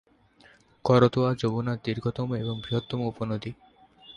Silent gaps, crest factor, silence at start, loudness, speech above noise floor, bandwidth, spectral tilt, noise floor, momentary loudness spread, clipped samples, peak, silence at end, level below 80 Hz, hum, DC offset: none; 22 dB; 0.85 s; -27 LUFS; 32 dB; 8.6 kHz; -8 dB/octave; -58 dBFS; 11 LU; under 0.1%; -6 dBFS; 0.05 s; -56 dBFS; none; under 0.1%